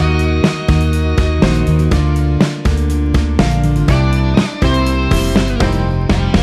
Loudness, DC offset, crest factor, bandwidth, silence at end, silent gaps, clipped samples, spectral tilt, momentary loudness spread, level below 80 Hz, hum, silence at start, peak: -14 LUFS; under 0.1%; 12 dB; 13.5 kHz; 0 s; none; under 0.1%; -6.5 dB/octave; 2 LU; -16 dBFS; none; 0 s; 0 dBFS